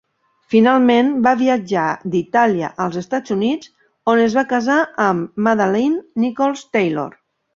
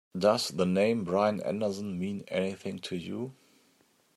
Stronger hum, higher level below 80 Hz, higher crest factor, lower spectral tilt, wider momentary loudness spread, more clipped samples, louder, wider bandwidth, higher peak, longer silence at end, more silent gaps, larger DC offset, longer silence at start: neither; first, -60 dBFS vs -74 dBFS; about the same, 16 dB vs 20 dB; about the same, -6 dB/octave vs -5.5 dB/octave; second, 8 LU vs 11 LU; neither; first, -17 LUFS vs -30 LUFS; second, 7.4 kHz vs 14.5 kHz; first, -2 dBFS vs -12 dBFS; second, 0.45 s vs 0.85 s; neither; neither; first, 0.5 s vs 0.15 s